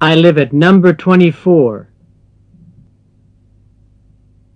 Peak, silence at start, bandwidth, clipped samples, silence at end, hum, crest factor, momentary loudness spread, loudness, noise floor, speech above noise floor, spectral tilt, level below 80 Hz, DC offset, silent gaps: 0 dBFS; 0 s; 7.8 kHz; 0.6%; 2.75 s; none; 12 dB; 5 LU; -10 LUFS; -50 dBFS; 41 dB; -8 dB/octave; -52 dBFS; under 0.1%; none